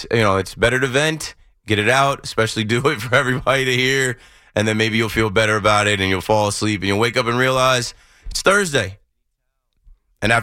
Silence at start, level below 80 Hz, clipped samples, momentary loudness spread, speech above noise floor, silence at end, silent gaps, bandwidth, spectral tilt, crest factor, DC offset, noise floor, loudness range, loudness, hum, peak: 0 s; -42 dBFS; under 0.1%; 7 LU; 54 dB; 0 s; none; 16.5 kHz; -4 dB/octave; 16 dB; under 0.1%; -72 dBFS; 2 LU; -17 LUFS; none; -2 dBFS